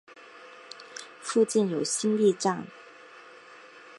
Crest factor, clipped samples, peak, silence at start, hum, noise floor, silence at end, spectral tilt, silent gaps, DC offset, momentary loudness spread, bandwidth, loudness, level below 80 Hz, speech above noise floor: 18 dB; under 0.1%; -12 dBFS; 0.1 s; none; -50 dBFS; 0.05 s; -4.5 dB/octave; none; under 0.1%; 25 LU; 11.5 kHz; -26 LUFS; -82 dBFS; 25 dB